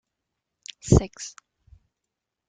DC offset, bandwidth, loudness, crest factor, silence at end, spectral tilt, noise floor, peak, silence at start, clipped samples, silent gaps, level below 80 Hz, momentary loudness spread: under 0.1%; 9.4 kHz; -22 LUFS; 26 dB; 1.2 s; -6.5 dB/octave; -84 dBFS; -2 dBFS; 0.85 s; under 0.1%; none; -38 dBFS; 22 LU